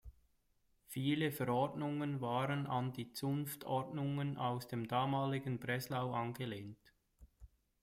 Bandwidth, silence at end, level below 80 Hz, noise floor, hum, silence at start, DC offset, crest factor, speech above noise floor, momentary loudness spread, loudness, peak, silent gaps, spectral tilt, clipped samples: 16 kHz; 0.35 s; -68 dBFS; -76 dBFS; none; 0.05 s; under 0.1%; 18 dB; 38 dB; 6 LU; -39 LUFS; -22 dBFS; none; -6.5 dB/octave; under 0.1%